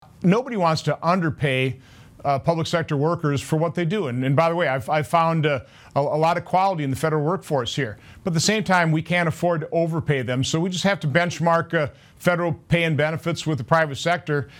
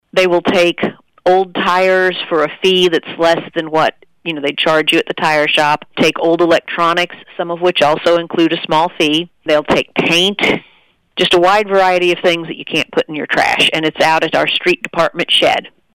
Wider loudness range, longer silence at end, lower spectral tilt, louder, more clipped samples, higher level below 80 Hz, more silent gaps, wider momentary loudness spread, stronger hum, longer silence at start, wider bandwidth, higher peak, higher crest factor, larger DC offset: about the same, 1 LU vs 1 LU; second, 0 s vs 0.25 s; first, -5.5 dB/octave vs -4 dB/octave; second, -22 LUFS vs -13 LUFS; neither; about the same, -54 dBFS vs -50 dBFS; neither; about the same, 5 LU vs 7 LU; neither; about the same, 0.2 s vs 0.15 s; about the same, 16 kHz vs 16.5 kHz; about the same, -2 dBFS vs -2 dBFS; first, 20 dB vs 12 dB; neither